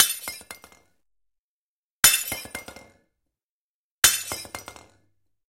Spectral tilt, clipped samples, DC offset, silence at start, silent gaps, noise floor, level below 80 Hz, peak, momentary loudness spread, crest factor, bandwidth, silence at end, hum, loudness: 1 dB/octave; under 0.1%; under 0.1%; 0 s; 1.38-2.03 s, 3.43-4.02 s; under -90 dBFS; -54 dBFS; 0 dBFS; 22 LU; 28 dB; 17 kHz; 0.75 s; none; -20 LUFS